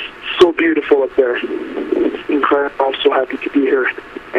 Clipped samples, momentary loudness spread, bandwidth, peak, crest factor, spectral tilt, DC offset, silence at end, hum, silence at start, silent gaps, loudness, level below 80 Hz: under 0.1%; 8 LU; 9.6 kHz; 0 dBFS; 16 dB; -5 dB/octave; under 0.1%; 0 s; none; 0 s; none; -16 LUFS; -50 dBFS